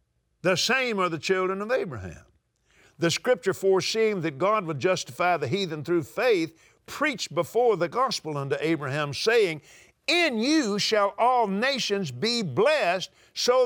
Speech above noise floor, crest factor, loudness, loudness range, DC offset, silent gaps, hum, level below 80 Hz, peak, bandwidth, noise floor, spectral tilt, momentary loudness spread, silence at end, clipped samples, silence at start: 40 dB; 14 dB; -25 LUFS; 3 LU; under 0.1%; none; none; -68 dBFS; -12 dBFS; over 20 kHz; -64 dBFS; -4 dB/octave; 7 LU; 0 s; under 0.1%; 0.45 s